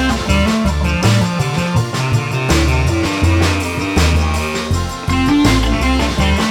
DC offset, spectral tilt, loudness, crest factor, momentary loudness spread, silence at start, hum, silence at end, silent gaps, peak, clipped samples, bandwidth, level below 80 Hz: under 0.1%; -5.5 dB/octave; -15 LUFS; 14 dB; 4 LU; 0 s; none; 0 s; none; 0 dBFS; under 0.1%; 17 kHz; -22 dBFS